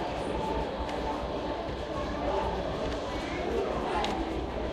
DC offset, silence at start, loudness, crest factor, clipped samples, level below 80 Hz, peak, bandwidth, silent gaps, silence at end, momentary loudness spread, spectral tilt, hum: under 0.1%; 0 s; -32 LUFS; 18 dB; under 0.1%; -42 dBFS; -14 dBFS; 13 kHz; none; 0 s; 3 LU; -6 dB/octave; none